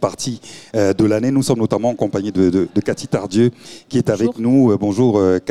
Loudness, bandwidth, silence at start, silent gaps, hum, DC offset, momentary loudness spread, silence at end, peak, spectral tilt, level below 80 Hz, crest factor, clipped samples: -17 LUFS; 13 kHz; 0 s; none; none; 0.3%; 7 LU; 0 s; -2 dBFS; -6.5 dB/octave; -52 dBFS; 14 dB; under 0.1%